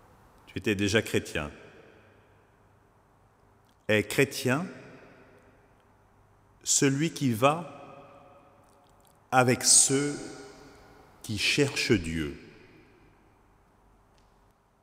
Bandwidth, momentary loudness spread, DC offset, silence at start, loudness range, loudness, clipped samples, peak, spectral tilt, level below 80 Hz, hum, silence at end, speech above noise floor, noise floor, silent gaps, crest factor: 16 kHz; 23 LU; under 0.1%; 0.5 s; 8 LU; -26 LUFS; under 0.1%; -6 dBFS; -3 dB/octave; -56 dBFS; none; 2.3 s; 37 dB; -64 dBFS; none; 24 dB